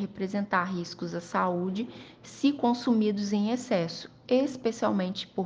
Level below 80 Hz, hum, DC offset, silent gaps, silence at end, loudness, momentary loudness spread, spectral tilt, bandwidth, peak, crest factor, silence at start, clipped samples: -68 dBFS; none; under 0.1%; none; 0 s; -29 LUFS; 10 LU; -6 dB/octave; 9.4 kHz; -10 dBFS; 18 dB; 0 s; under 0.1%